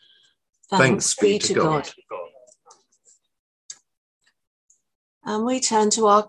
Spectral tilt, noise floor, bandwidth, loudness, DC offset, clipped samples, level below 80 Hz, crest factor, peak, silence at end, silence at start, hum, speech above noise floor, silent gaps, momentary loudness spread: -3.5 dB/octave; -61 dBFS; 12 kHz; -20 LUFS; under 0.1%; under 0.1%; -62 dBFS; 22 dB; -2 dBFS; 0 s; 0.7 s; none; 41 dB; 3.39-3.69 s, 3.97-4.20 s, 4.47-4.68 s, 4.95-5.21 s; 24 LU